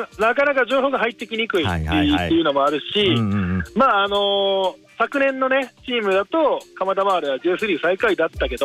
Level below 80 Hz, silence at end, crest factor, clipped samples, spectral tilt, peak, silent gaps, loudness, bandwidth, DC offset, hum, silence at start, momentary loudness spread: -42 dBFS; 0 s; 12 dB; under 0.1%; -6 dB/octave; -6 dBFS; none; -19 LUFS; 15 kHz; under 0.1%; none; 0 s; 6 LU